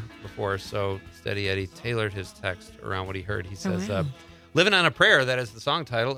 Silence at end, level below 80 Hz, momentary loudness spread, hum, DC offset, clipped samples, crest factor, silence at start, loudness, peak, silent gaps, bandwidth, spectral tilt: 0 s; -56 dBFS; 14 LU; none; under 0.1%; under 0.1%; 22 dB; 0 s; -25 LUFS; -4 dBFS; none; 15.5 kHz; -4.5 dB/octave